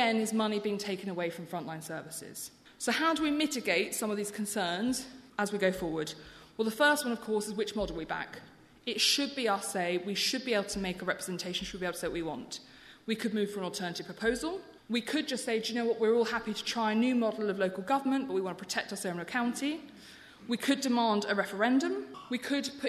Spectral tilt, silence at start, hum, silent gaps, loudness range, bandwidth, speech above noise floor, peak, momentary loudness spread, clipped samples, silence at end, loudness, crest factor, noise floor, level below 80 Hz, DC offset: -3.5 dB/octave; 0 s; none; none; 4 LU; 13.5 kHz; 21 dB; -14 dBFS; 12 LU; under 0.1%; 0 s; -32 LUFS; 18 dB; -53 dBFS; -62 dBFS; under 0.1%